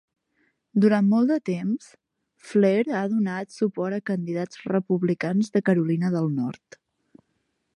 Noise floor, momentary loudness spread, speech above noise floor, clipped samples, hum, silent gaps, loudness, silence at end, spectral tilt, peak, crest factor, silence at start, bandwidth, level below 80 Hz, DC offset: -74 dBFS; 9 LU; 51 dB; under 0.1%; none; none; -24 LUFS; 1.25 s; -8 dB/octave; -8 dBFS; 18 dB; 0.75 s; 10.5 kHz; -74 dBFS; under 0.1%